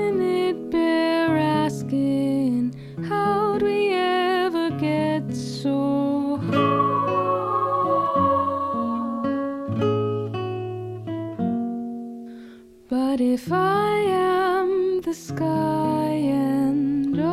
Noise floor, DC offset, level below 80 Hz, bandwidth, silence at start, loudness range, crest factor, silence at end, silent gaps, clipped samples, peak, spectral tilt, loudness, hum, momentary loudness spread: -45 dBFS; under 0.1%; -58 dBFS; 14 kHz; 0 s; 5 LU; 14 dB; 0 s; none; under 0.1%; -8 dBFS; -7 dB/octave; -23 LUFS; none; 9 LU